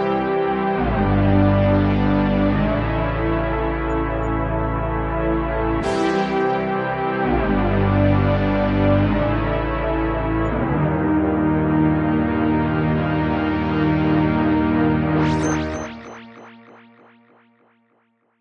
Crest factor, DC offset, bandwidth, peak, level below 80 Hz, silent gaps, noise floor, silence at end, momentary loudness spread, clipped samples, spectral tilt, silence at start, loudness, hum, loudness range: 14 dB; under 0.1%; 8.6 kHz; -6 dBFS; -30 dBFS; none; -64 dBFS; 1.85 s; 5 LU; under 0.1%; -8 dB/octave; 0 s; -20 LUFS; none; 3 LU